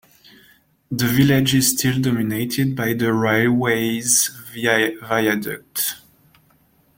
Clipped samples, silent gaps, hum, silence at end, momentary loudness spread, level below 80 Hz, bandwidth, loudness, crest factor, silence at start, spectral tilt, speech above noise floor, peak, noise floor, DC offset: under 0.1%; none; none; 1 s; 8 LU; -52 dBFS; 17 kHz; -19 LUFS; 18 dB; 0.9 s; -4 dB/octave; 39 dB; -2 dBFS; -58 dBFS; under 0.1%